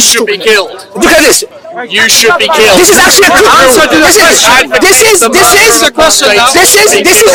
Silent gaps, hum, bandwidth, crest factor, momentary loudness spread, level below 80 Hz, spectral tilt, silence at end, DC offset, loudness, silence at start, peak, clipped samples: none; none; over 20 kHz; 4 dB; 6 LU; -32 dBFS; -1 dB/octave; 0 s; under 0.1%; -3 LUFS; 0 s; 0 dBFS; 10%